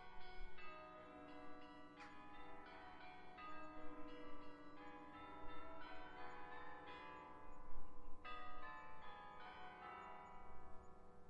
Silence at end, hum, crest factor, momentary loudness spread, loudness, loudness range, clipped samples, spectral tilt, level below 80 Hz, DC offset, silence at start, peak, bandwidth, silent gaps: 0 s; none; 16 dB; 6 LU; -58 LUFS; 2 LU; under 0.1%; -5.5 dB/octave; -62 dBFS; under 0.1%; 0 s; -32 dBFS; 7.2 kHz; none